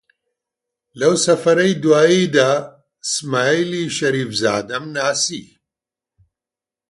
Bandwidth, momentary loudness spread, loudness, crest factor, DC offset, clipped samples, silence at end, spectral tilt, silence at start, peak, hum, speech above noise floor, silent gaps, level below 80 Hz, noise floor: 11.5 kHz; 9 LU; -17 LUFS; 18 dB; under 0.1%; under 0.1%; 1.5 s; -4 dB/octave; 0.95 s; -2 dBFS; none; 72 dB; none; -62 dBFS; -89 dBFS